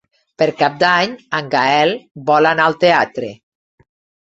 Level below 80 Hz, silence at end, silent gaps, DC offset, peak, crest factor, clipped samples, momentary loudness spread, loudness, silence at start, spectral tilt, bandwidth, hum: -60 dBFS; 0.9 s; 2.11-2.15 s; under 0.1%; -2 dBFS; 16 dB; under 0.1%; 10 LU; -15 LUFS; 0.4 s; -5 dB/octave; 8 kHz; none